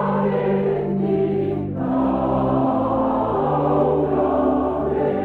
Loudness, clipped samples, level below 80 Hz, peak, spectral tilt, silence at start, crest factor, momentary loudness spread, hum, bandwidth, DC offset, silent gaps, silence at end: -20 LUFS; under 0.1%; -42 dBFS; -8 dBFS; -10.5 dB/octave; 0 s; 12 dB; 3 LU; none; 4.5 kHz; under 0.1%; none; 0 s